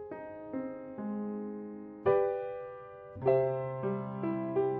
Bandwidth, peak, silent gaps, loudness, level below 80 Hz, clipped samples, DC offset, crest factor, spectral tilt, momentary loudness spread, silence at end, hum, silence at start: 4.3 kHz; -16 dBFS; none; -34 LUFS; -68 dBFS; under 0.1%; under 0.1%; 18 dB; -8.5 dB/octave; 15 LU; 0 s; none; 0 s